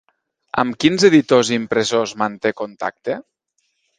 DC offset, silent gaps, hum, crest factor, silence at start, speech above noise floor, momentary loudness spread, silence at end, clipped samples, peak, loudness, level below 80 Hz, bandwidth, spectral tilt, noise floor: under 0.1%; none; none; 18 dB; 0.55 s; 52 dB; 13 LU; 0.75 s; under 0.1%; 0 dBFS; -18 LUFS; -58 dBFS; 9.8 kHz; -4.5 dB/octave; -69 dBFS